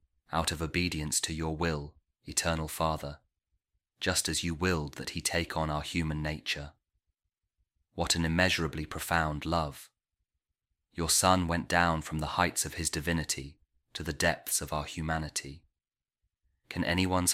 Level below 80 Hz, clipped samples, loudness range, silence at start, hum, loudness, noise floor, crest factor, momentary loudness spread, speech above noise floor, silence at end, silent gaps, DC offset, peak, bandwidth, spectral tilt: -48 dBFS; under 0.1%; 5 LU; 0.3 s; none; -31 LUFS; under -90 dBFS; 24 dB; 11 LU; over 59 dB; 0 s; none; under 0.1%; -8 dBFS; 16 kHz; -3.5 dB/octave